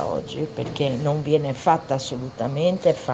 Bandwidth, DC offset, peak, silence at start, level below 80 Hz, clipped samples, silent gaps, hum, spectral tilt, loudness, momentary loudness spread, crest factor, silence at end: 8.4 kHz; under 0.1%; -4 dBFS; 0 s; -54 dBFS; under 0.1%; none; none; -6.5 dB/octave; -23 LUFS; 8 LU; 18 dB; 0 s